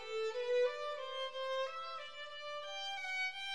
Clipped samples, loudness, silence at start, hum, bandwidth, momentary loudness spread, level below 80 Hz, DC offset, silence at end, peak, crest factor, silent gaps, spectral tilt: under 0.1%; -40 LUFS; 0 s; none; 11.5 kHz; 10 LU; -80 dBFS; 0.2%; 0 s; -26 dBFS; 14 dB; none; 0.5 dB/octave